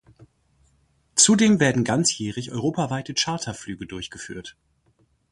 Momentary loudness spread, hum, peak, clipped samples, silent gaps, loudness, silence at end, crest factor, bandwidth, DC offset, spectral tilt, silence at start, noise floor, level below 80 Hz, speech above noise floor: 19 LU; none; -2 dBFS; under 0.1%; none; -21 LUFS; 0.8 s; 22 dB; 11.5 kHz; under 0.1%; -3.5 dB/octave; 1.15 s; -64 dBFS; -56 dBFS; 42 dB